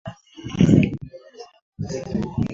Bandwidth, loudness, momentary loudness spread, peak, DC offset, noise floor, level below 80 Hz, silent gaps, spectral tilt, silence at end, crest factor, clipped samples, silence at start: 7.6 kHz; -21 LUFS; 23 LU; -2 dBFS; under 0.1%; -43 dBFS; -42 dBFS; 1.62-1.72 s; -7.5 dB/octave; 0 s; 20 dB; under 0.1%; 0.05 s